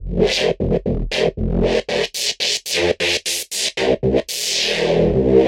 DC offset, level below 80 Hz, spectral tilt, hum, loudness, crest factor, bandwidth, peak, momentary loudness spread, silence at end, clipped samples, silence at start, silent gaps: under 0.1%; -32 dBFS; -3.5 dB/octave; none; -18 LUFS; 16 dB; 16.5 kHz; -2 dBFS; 4 LU; 0 s; under 0.1%; 0 s; none